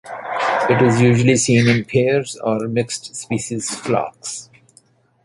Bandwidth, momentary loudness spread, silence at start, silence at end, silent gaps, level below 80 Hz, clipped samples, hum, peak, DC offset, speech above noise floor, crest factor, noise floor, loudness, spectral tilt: 11.5 kHz; 13 LU; 0.05 s; 0.8 s; none; -52 dBFS; under 0.1%; none; -2 dBFS; under 0.1%; 37 dB; 16 dB; -55 dBFS; -18 LUFS; -5 dB/octave